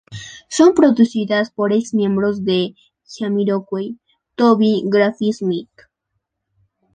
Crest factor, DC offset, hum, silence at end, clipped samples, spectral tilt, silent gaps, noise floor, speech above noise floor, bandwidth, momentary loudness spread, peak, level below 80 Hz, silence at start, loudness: 16 dB; under 0.1%; none; 1.3 s; under 0.1%; -6 dB/octave; none; -75 dBFS; 59 dB; 9.6 kHz; 13 LU; 0 dBFS; -60 dBFS; 0.1 s; -17 LUFS